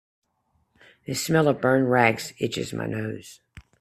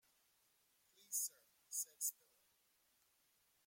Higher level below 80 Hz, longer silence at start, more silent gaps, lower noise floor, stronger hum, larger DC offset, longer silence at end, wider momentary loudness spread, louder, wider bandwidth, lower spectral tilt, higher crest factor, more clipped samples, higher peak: first, -60 dBFS vs under -90 dBFS; about the same, 1.1 s vs 1.1 s; neither; second, -70 dBFS vs -79 dBFS; neither; neither; second, 0.2 s vs 1.55 s; first, 13 LU vs 4 LU; first, -24 LUFS vs -44 LUFS; about the same, 15.5 kHz vs 16.5 kHz; first, -5 dB/octave vs 3.5 dB/octave; about the same, 22 dB vs 24 dB; neither; first, -2 dBFS vs -28 dBFS